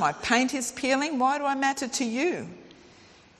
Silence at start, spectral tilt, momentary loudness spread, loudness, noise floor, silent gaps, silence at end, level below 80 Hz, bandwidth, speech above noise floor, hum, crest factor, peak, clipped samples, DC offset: 0 s; -2.5 dB/octave; 5 LU; -26 LUFS; -54 dBFS; none; 0.7 s; -64 dBFS; 13.5 kHz; 28 dB; none; 20 dB; -8 dBFS; under 0.1%; under 0.1%